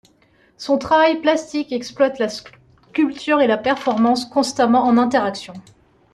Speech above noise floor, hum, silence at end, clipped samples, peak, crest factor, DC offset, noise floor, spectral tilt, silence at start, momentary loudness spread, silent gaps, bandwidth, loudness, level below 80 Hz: 39 dB; none; 0.55 s; under 0.1%; -4 dBFS; 16 dB; under 0.1%; -56 dBFS; -4.5 dB/octave; 0.6 s; 12 LU; none; 12 kHz; -18 LUFS; -58 dBFS